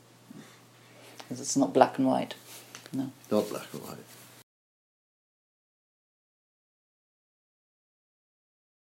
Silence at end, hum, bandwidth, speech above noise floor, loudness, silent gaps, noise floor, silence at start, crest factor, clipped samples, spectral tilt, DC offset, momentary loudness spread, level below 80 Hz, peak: 4.7 s; none; 16 kHz; 26 dB; -29 LUFS; none; -55 dBFS; 0.35 s; 30 dB; under 0.1%; -4.5 dB/octave; under 0.1%; 26 LU; -86 dBFS; -4 dBFS